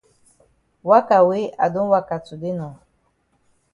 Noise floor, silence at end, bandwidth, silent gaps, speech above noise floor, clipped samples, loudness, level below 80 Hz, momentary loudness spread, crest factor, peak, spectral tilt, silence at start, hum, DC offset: -65 dBFS; 1 s; 11 kHz; none; 47 dB; under 0.1%; -19 LUFS; -62 dBFS; 15 LU; 20 dB; 0 dBFS; -8 dB/octave; 0.85 s; none; under 0.1%